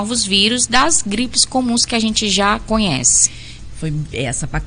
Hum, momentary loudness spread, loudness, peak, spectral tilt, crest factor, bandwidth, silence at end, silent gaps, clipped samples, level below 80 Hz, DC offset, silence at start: none; 11 LU; -15 LUFS; 0 dBFS; -2 dB/octave; 16 dB; 10.5 kHz; 0 s; none; under 0.1%; -34 dBFS; under 0.1%; 0 s